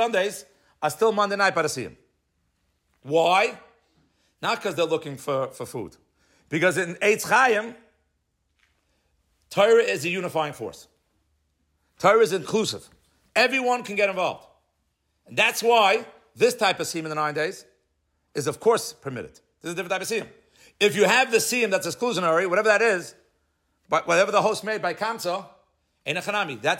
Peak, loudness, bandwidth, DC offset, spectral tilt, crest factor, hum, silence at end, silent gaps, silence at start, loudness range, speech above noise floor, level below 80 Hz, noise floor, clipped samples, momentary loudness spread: -6 dBFS; -23 LUFS; 16.5 kHz; under 0.1%; -3 dB/octave; 18 dB; none; 0 s; none; 0 s; 5 LU; 50 dB; -70 dBFS; -73 dBFS; under 0.1%; 16 LU